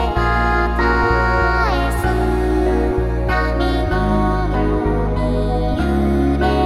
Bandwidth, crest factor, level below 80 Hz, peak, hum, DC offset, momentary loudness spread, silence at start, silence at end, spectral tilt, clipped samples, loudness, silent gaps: 12.5 kHz; 14 dB; -20 dBFS; -4 dBFS; none; 0.2%; 3 LU; 0 s; 0 s; -7.5 dB/octave; under 0.1%; -18 LUFS; none